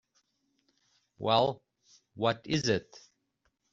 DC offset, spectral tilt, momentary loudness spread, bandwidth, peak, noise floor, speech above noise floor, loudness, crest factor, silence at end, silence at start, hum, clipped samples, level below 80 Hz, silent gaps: under 0.1%; -3.5 dB/octave; 8 LU; 7.6 kHz; -12 dBFS; -78 dBFS; 48 dB; -30 LUFS; 22 dB; 0.9 s; 1.2 s; none; under 0.1%; -68 dBFS; none